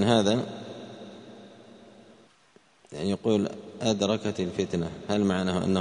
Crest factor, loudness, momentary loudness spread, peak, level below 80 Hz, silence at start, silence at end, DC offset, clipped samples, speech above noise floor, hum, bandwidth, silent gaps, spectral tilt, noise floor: 22 dB; -27 LUFS; 20 LU; -6 dBFS; -60 dBFS; 0 s; 0 s; under 0.1%; under 0.1%; 34 dB; none; 10.5 kHz; none; -5.5 dB/octave; -60 dBFS